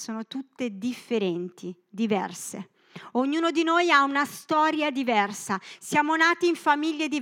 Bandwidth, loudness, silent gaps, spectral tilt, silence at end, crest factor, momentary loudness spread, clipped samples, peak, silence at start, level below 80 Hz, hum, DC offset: 16.5 kHz; -25 LUFS; none; -3.5 dB/octave; 0 s; 20 dB; 16 LU; under 0.1%; -6 dBFS; 0 s; -84 dBFS; none; under 0.1%